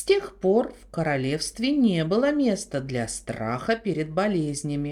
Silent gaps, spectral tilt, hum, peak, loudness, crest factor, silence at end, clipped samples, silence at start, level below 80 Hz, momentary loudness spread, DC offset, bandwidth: none; -5.5 dB/octave; none; -8 dBFS; -25 LUFS; 16 dB; 0 s; under 0.1%; 0 s; -52 dBFS; 8 LU; under 0.1%; 14.5 kHz